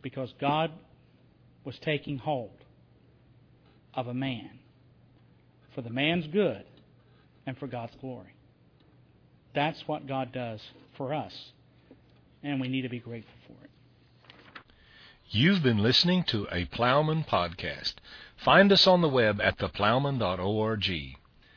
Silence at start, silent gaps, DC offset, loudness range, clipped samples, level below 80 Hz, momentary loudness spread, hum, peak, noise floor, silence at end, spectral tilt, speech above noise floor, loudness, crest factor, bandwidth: 0.05 s; none; under 0.1%; 15 LU; under 0.1%; -58 dBFS; 21 LU; none; -8 dBFS; -61 dBFS; 0.4 s; -6 dB/octave; 33 dB; -27 LUFS; 22 dB; 5.4 kHz